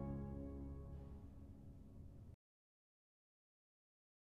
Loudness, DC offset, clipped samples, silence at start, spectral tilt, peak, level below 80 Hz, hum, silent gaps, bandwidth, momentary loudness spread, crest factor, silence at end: -55 LUFS; under 0.1%; under 0.1%; 0 s; -10 dB/octave; -36 dBFS; -60 dBFS; none; none; 6.6 kHz; 12 LU; 18 dB; 1.9 s